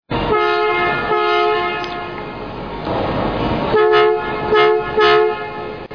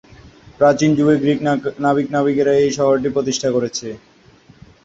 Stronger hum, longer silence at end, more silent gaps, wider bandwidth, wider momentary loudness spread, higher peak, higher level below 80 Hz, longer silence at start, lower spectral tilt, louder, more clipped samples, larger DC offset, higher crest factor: neither; second, 0 s vs 0.9 s; neither; second, 5.4 kHz vs 7.8 kHz; first, 14 LU vs 8 LU; about the same, -4 dBFS vs -2 dBFS; first, -38 dBFS vs -52 dBFS; second, 0.1 s vs 0.25 s; about the same, -6.5 dB/octave vs -5.5 dB/octave; about the same, -16 LUFS vs -17 LUFS; neither; first, 0.4% vs under 0.1%; about the same, 12 dB vs 16 dB